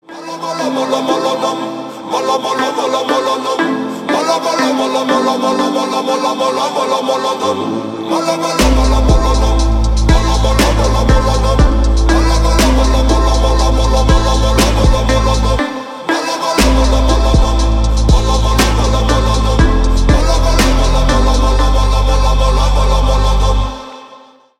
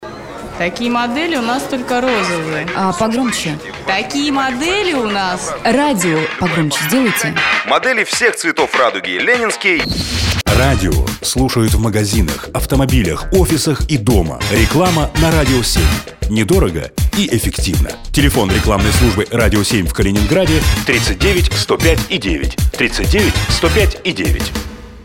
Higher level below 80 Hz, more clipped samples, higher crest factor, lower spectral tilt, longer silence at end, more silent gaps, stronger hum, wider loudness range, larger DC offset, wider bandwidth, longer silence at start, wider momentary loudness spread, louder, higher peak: first, -14 dBFS vs -22 dBFS; neither; about the same, 12 dB vs 14 dB; about the same, -5 dB/octave vs -4.5 dB/octave; first, 0.45 s vs 0 s; neither; neither; about the same, 3 LU vs 3 LU; neither; second, 14.5 kHz vs 16.5 kHz; about the same, 0.1 s vs 0 s; about the same, 5 LU vs 5 LU; about the same, -13 LUFS vs -14 LUFS; about the same, 0 dBFS vs 0 dBFS